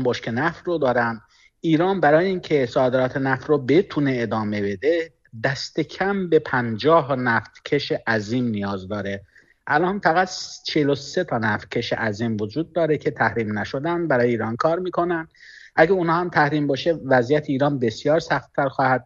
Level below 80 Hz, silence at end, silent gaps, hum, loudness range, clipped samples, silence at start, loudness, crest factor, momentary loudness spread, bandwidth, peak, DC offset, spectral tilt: -56 dBFS; 0.05 s; none; none; 3 LU; under 0.1%; 0 s; -22 LUFS; 18 dB; 8 LU; 7.6 kHz; -2 dBFS; under 0.1%; -6 dB/octave